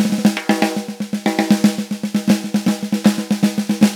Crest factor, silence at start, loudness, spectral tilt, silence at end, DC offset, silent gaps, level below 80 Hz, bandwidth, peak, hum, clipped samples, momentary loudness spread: 16 dB; 0 s; -18 LUFS; -5.5 dB/octave; 0 s; under 0.1%; none; -62 dBFS; 17.5 kHz; 0 dBFS; none; under 0.1%; 6 LU